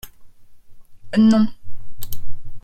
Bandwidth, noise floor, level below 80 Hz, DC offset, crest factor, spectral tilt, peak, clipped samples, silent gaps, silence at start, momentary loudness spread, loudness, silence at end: 16.5 kHz; -39 dBFS; -38 dBFS; under 0.1%; 12 dB; -6.5 dB/octave; -6 dBFS; under 0.1%; none; 0.05 s; 22 LU; -17 LUFS; 0.05 s